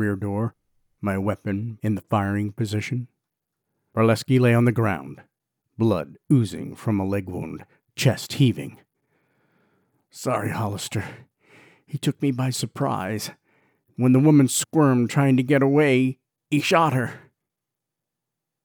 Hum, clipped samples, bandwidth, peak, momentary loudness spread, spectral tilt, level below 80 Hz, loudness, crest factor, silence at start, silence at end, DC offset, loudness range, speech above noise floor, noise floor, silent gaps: none; under 0.1%; over 20 kHz; -4 dBFS; 14 LU; -6 dB/octave; -64 dBFS; -23 LUFS; 18 dB; 0 s; 1.45 s; under 0.1%; 8 LU; 63 dB; -85 dBFS; none